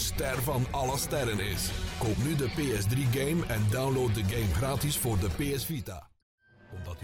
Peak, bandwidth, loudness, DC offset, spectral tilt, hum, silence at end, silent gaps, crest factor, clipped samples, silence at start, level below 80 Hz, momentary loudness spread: -20 dBFS; 17 kHz; -30 LUFS; under 0.1%; -5 dB/octave; none; 0 s; 6.22-6.38 s; 10 dB; under 0.1%; 0 s; -42 dBFS; 6 LU